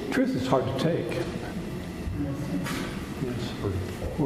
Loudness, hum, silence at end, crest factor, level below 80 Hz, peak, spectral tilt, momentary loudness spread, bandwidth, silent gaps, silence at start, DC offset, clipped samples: -30 LUFS; none; 0 s; 20 dB; -44 dBFS; -8 dBFS; -6.5 dB/octave; 9 LU; 15.5 kHz; none; 0 s; under 0.1%; under 0.1%